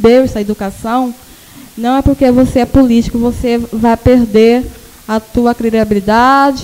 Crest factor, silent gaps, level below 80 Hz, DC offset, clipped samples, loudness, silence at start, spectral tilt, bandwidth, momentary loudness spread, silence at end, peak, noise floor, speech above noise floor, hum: 10 dB; none; -28 dBFS; under 0.1%; under 0.1%; -11 LUFS; 0 s; -6.5 dB/octave; 16.5 kHz; 10 LU; 0 s; 0 dBFS; -36 dBFS; 26 dB; none